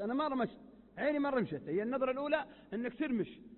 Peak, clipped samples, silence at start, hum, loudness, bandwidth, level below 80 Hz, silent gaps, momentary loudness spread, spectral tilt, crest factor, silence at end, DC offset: -20 dBFS; under 0.1%; 0 s; none; -36 LUFS; 4.2 kHz; -70 dBFS; none; 7 LU; -4.5 dB/octave; 16 dB; 0 s; under 0.1%